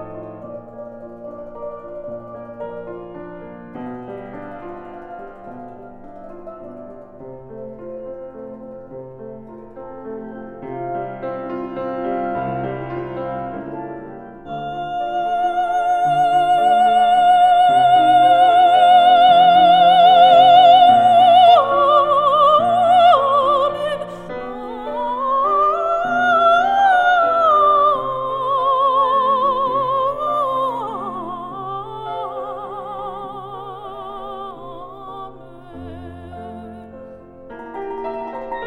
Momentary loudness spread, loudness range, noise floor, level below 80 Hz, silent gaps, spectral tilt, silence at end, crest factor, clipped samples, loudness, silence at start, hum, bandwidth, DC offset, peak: 25 LU; 24 LU; -38 dBFS; -52 dBFS; none; -5 dB/octave; 0 s; 16 dB; under 0.1%; -14 LUFS; 0 s; none; 9.2 kHz; under 0.1%; -2 dBFS